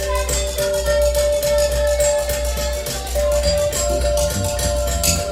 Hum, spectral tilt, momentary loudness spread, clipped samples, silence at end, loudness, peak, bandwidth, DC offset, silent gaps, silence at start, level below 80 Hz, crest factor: none; -3 dB/octave; 4 LU; under 0.1%; 0 s; -19 LUFS; -2 dBFS; 16 kHz; under 0.1%; none; 0 s; -24 dBFS; 16 dB